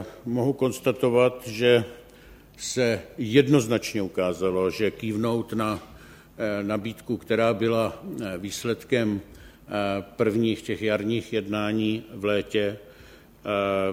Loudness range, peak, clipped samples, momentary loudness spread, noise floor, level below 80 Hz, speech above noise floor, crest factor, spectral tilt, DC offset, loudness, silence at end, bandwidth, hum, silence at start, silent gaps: 4 LU; -6 dBFS; under 0.1%; 10 LU; -50 dBFS; -56 dBFS; 25 dB; 20 dB; -5.5 dB/octave; under 0.1%; -26 LUFS; 0 s; 16 kHz; none; 0 s; none